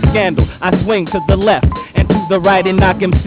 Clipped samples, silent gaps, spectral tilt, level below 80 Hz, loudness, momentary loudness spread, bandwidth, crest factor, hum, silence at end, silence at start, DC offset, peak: under 0.1%; none; -11 dB/octave; -20 dBFS; -13 LUFS; 4 LU; 4 kHz; 12 dB; none; 0 s; 0 s; under 0.1%; 0 dBFS